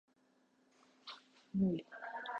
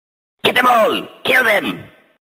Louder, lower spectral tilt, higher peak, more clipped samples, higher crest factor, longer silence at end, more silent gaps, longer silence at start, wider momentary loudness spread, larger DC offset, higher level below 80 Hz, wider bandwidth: second, -39 LUFS vs -14 LUFS; first, -8 dB/octave vs -3 dB/octave; second, -24 dBFS vs 0 dBFS; neither; about the same, 18 dB vs 16 dB; second, 0 s vs 0.35 s; neither; first, 1.05 s vs 0.45 s; first, 19 LU vs 11 LU; neither; second, -72 dBFS vs -60 dBFS; second, 6.8 kHz vs 16 kHz